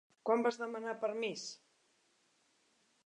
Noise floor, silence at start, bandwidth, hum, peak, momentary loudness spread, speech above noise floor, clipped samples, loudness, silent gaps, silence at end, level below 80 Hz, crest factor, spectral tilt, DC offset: -75 dBFS; 0.25 s; 10 kHz; none; -18 dBFS; 13 LU; 38 dB; under 0.1%; -37 LUFS; none; 1.5 s; under -90 dBFS; 22 dB; -3.5 dB/octave; under 0.1%